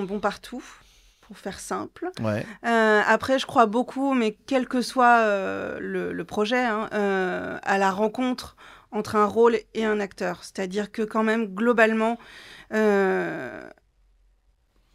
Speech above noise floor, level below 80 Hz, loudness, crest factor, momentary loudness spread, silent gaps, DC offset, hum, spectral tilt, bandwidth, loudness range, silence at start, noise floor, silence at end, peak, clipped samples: 40 dB; -60 dBFS; -24 LUFS; 20 dB; 15 LU; none; under 0.1%; none; -5 dB/octave; 15 kHz; 4 LU; 0 s; -64 dBFS; 1.3 s; -6 dBFS; under 0.1%